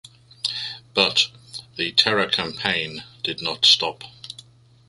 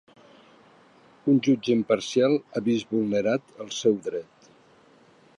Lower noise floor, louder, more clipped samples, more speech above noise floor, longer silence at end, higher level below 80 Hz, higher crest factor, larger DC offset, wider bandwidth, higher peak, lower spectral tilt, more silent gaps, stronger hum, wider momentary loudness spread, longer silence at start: second, -49 dBFS vs -57 dBFS; first, -20 LUFS vs -25 LUFS; neither; second, 27 dB vs 33 dB; second, 0.55 s vs 1.2 s; first, -60 dBFS vs -70 dBFS; about the same, 24 dB vs 20 dB; neither; about the same, 11.5 kHz vs 11 kHz; first, -2 dBFS vs -8 dBFS; second, -2 dB/octave vs -5.5 dB/octave; neither; neither; first, 22 LU vs 9 LU; second, 0.45 s vs 1.25 s